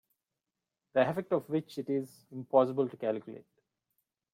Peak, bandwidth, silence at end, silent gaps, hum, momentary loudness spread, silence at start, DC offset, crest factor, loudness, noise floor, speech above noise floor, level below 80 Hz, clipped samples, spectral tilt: -12 dBFS; 15.5 kHz; 0.9 s; none; none; 17 LU; 0.95 s; under 0.1%; 22 dB; -32 LUFS; -89 dBFS; 58 dB; -78 dBFS; under 0.1%; -7.5 dB/octave